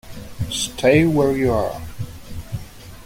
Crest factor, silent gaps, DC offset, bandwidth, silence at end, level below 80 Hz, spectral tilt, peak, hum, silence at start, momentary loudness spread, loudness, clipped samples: 18 dB; none; under 0.1%; 16.5 kHz; 0 s; -40 dBFS; -5.5 dB/octave; -2 dBFS; none; 0.05 s; 20 LU; -19 LUFS; under 0.1%